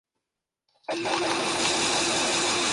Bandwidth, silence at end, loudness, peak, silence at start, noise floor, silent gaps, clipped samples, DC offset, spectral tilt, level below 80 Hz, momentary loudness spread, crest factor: 11.5 kHz; 0 s; -24 LUFS; -12 dBFS; 0.9 s; -86 dBFS; none; under 0.1%; under 0.1%; -1 dB/octave; -60 dBFS; 9 LU; 16 dB